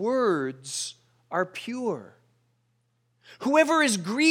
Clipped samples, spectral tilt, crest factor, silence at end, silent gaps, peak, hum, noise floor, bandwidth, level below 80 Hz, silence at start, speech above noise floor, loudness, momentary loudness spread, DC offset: under 0.1%; -3.5 dB/octave; 20 dB; 0 s; none; -8 dBFS; none; -71 dBFS; 17 kHz; -82 dBFS; 0 s; 46 dB; -26 LUFS; 11 LU; under 0.1%